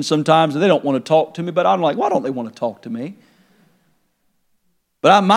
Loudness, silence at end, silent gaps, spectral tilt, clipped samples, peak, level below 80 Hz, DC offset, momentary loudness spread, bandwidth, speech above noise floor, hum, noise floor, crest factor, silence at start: -17 LUFS; 0 s; none; -5.5 dB/octave; under 0.1%; 0 dBFS; -74 dBFS; under 0.1%; 14 LU; 13 kHz; 48 dB; none; -65 dBFS; 18 dB; 0 s